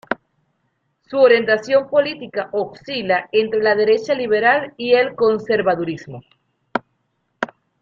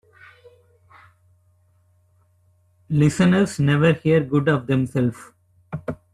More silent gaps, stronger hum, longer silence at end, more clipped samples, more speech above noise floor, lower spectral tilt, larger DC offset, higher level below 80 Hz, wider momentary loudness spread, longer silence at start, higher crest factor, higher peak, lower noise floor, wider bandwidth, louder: neither; neither; first, 0.35 s vs 0.2 s; neither; first, 52 dB vs 42 dB; second, -5.5 dB/octave vs -7 dB/octave; neither; second, -62 dBFS vs -54 dBFS; about the same, 13 LU vs 15 LU; second, 0.1 s vs 2.9 s; about the same, 18 dB vs 18 dB; about the same, -2 dBFS vs -4 dBFS; first, -69 dBFS vs -60 dBFS; second, 7.2 kHz vs 12.5 kHz; about the same, -18 LUFS vs -20 LUFS